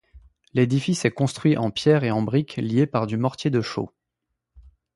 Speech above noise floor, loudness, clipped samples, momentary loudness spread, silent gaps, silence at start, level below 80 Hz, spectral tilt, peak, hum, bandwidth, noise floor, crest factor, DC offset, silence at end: 59 dB; -23 LUFS; under 0.1%; 6 LU; none; 0.15 s; -56 dBFS; -6.5 dB/octave; -4 dBFS; none; 11.5 kHz; -81 dBFS; 20 dB; under 0.1%; 0.35 s